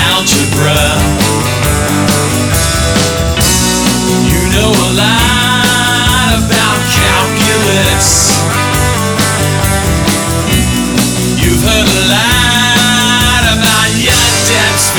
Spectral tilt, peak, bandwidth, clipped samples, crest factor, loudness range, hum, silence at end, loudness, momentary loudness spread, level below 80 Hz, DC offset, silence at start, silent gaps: -3 dB/octave; 0 dBFS; over 20 kHz; under 0.1%; 10 dB; 2 LU; none; 0 s; -9 LUFS; 4 LU; -20 dBFS; under 0.1%; 0 s; none